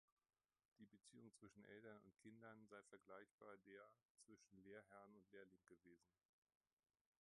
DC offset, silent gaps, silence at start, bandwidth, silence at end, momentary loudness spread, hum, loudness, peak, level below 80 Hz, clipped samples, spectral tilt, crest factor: under 0.1%; 3.31-3.38 s, 4.05-4.15 s; 0.8 s; 10.5 kHz; 1.1 s; 4 LU; none; -66 LUFS; -48 dBFS; under -90 dBFS; under 0.1%; -5 dB/octave; 20 dB